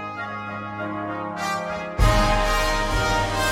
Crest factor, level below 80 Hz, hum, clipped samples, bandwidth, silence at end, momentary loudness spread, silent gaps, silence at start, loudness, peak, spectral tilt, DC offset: 18 dB; -28 dBFS; none; under 0.1%; 16.5 kHz; 0 s; 11 LU; none; 0 s; -24 LUFS; -6 dBFS; -4.5 dB/octave; under 0.1%